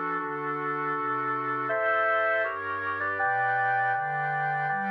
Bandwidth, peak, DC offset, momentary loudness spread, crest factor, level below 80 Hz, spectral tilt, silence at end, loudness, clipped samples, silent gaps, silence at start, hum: 5.6 kHz; -14 dBFS; under 0.1%; 6 LU; 12 dB; -78 dBFS; -7.5 dB/octave; 0 s; -27 LUFS; under 0.1%; none; 0 s; 50 Hz at -75 dBFS